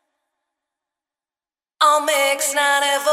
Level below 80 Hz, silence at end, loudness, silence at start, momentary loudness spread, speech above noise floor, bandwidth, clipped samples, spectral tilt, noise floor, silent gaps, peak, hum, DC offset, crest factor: under -90 dBFS; 0 s; -17 LUFS; 1.8 s; 2 LU; over 72 dB; 16.5 kHz; under 0.1%; 3 dB/octave; under -90 dBFS; none; -4 dBFS; none; under 0.1%; 18 dB